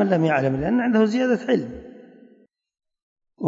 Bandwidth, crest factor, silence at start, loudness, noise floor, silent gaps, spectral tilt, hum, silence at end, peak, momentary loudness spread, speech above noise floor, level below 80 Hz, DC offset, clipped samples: 7.8 kHz; 16 dB; 0 s; -21 LUFS; -57 dBFS; 3.02-3.16 s; -7.5 dB/octave; none; 0 s; -8 dBFS; 8 LU; 37 dB; -52 dBFS; under 0.1%; under 0.1%